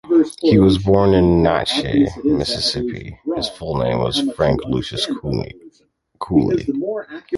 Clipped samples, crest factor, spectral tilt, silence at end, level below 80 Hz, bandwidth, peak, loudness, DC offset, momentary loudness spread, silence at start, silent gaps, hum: under 0.1%; 18 dB; -6.5 dB/octave; 0 s; -36 dBFS; 11.5 kHz; 0 dBFS; -18 LUFS; under 0.1%; 12 LU; 0.05 s; none; none